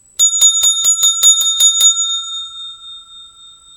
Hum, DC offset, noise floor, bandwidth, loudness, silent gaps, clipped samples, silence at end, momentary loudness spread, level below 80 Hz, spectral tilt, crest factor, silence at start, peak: none; under 0.1%; -41 dBFS; 17.5 kHz; -9 LUFS; none; under 0.1%; 0.5 s; 17 LU; -60 dBFS; 4.5 dB/octave; 14 dB; 0.2 s; 0 dBFS